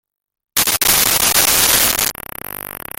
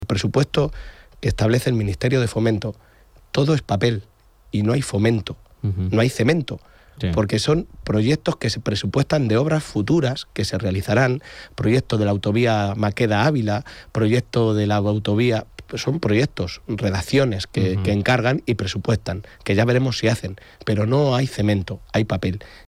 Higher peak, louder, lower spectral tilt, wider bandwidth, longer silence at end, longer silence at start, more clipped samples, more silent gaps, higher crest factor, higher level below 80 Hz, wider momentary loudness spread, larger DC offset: first, 0 dBFS vs -8 dBFS; first, -12 LUFS vs -21 LUFS; second, 0 dB/octave vs -6.5 dB/octave; first, over 20 kHz vs 15 kHz; first, 0.25 s vs 0.05 s; first, 0.55 s vs 0 s; neither; neither; about the same, 16 dB vs 14 dB; about the same, -40 dBFS vs -44 dBFS; first, 17 LU vs 8 LU; neither